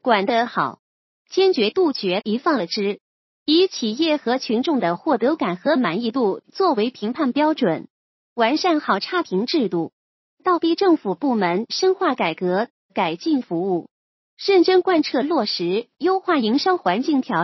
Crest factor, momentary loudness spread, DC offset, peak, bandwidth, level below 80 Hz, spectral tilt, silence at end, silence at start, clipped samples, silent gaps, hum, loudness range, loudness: 18 dB; 7 LU; under 0.1%; -2 dBFS; 6.2 kHz; -74 dBFS; -5.5 dB/octave; 0 s; 0.05 s; under 0.1%; 0.79-1.25 s, 3.01-3.46 s, 7.90-8.36 s, 9.93-10.37 s, 12.70-12.89 s, 13.91-14.37 s; none; 2 LU; -20 LUFS